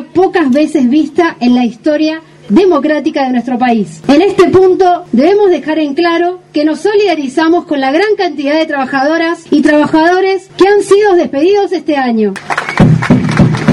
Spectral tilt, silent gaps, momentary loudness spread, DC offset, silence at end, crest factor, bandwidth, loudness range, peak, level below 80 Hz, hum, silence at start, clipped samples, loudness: -6.5 dB/octave; none; 6 LU; under 0.1%; 0 s; 10 dB; 11.5 kHz; 2 LU; 0 dBFS; -38 dBFS; none; 0 s; 0.3%; -10 LUFS